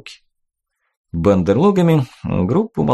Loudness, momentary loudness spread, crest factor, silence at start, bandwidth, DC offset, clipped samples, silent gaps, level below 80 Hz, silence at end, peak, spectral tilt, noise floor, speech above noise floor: -16 LUFS; 8 LU; 14 dB; 0.05 s; 12.5 kHz; under 0.1%; under 0.1%; 0.97-1.04 s; -42 dBFS; 0 s; -2 dBFS; -8.5 dB/octave; -74 dBFS; 58 dB